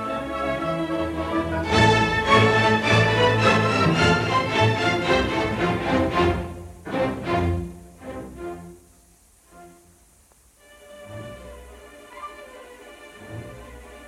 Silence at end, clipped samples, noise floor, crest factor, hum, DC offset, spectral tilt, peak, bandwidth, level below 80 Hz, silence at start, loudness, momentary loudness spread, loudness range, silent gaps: 0 s; under 0.1%; -56 dBFS; 22 dB; none; under 0.1%; -5.5 dB/octave; -2 dBFS; 13.5 kHz; -42 dBFS; 0 s; -21 LUFS; 23 LU; 24 LU; none